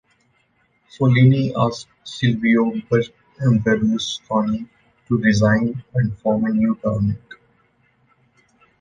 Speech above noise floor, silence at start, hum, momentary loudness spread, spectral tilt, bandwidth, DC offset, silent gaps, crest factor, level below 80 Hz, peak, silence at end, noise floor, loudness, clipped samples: 45 dB; 1 s; none; 9 LU; -7 dB/octave; 9.4 kHz; under 0.1%; none; 18 dB; -48 dBFS; -2 dBFS; 1.45 s; -63 dBFS; -19 LUFS; under 0.1%